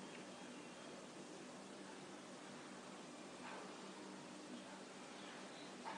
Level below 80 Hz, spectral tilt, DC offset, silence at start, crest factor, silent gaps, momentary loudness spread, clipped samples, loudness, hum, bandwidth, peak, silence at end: under -90 dBFS; -3.5 dB/octave; under 0.1%; 0 s; 18 dB; none; 2 LU; under 0.1%; -54 LUFS; none; 10 kHz; -38 dBFS; 0 s